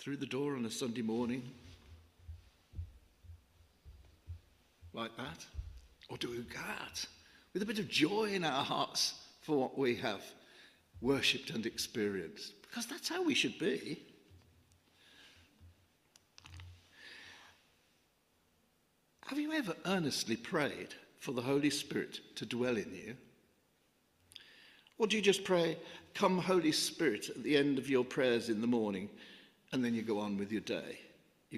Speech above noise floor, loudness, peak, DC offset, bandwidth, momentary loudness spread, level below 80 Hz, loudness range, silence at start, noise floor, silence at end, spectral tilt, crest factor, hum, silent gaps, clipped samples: 39 dB; -36 LUFS; -16 dBFS; under 0.1%; 15.5 kHz; 22 LU; -64 dBFS; 17 LU; 0 s; -75 dBFS; 0 s; -4 dB/octave; 22 dB; none; none; under 0.1%